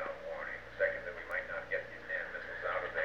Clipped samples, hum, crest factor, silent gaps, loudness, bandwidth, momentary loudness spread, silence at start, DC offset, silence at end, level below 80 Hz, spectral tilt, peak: under 0.1%; 60 Hz at -60 dBFS; 20 dB; none; -38 LUFS; 8.6 kHz; 7 LU; 0 s; 0.1%; 0 s; -62 dBFS; -4.5 dB/octave; -20 dBFS